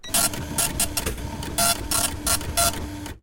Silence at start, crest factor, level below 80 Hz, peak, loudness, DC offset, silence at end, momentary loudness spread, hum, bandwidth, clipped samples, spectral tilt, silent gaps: 0.05 s; 16 dB; -38 dBFS; -8 dBFS; -23 LUFS; under 0.1%; 0.05 s; 10 LU; none; 17 kHz; under 0.1%; -2 dB/octave; none